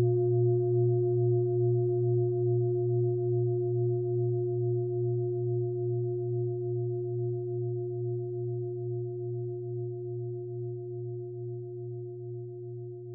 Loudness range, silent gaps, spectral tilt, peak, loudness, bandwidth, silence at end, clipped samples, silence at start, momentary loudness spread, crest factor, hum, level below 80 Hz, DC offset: 10 LU; none; -16.5 dB/octave; -18 dBFS; -31 LUFS; 1.2 kHz; 0 s; under 0.1%; 0 s; 12 LU; 12 dB; none; -74 dBFS; under 0.1%